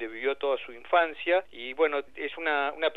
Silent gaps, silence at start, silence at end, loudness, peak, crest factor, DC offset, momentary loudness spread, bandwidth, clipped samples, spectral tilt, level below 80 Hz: none; 0 s; 0 s; -28 LUFS; -10 dBFS; 18 dB; 0.4%; 7 LU; 4.6 kHz; under 0.1%; -4.5 dB/octave; -68 dBFS